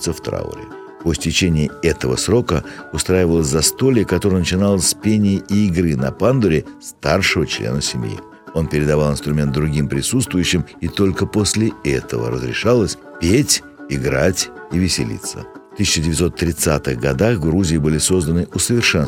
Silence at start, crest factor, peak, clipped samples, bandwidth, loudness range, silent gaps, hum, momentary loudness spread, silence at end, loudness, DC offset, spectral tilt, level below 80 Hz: 0 s; 16 dB; 0 dBFS; under 0.1%; 16.5 kHz; 3 LU; none; none; 9 LU; 0 s; -17 LUFS; under 0.1%; -4.5 dB/octave; -36 dBFS